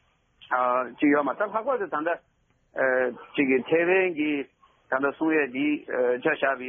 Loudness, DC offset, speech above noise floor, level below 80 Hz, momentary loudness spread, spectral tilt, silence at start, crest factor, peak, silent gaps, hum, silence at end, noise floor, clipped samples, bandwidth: -25 LUFS; under 0.1%; 32 dB; -72 dBFS; 7 LU; -3.5 dB/octave; 0.5 s; 16 dB; -10 dBFS; none; none; 0 s; -57 dBFS; under 0.1%; 3.7 kHz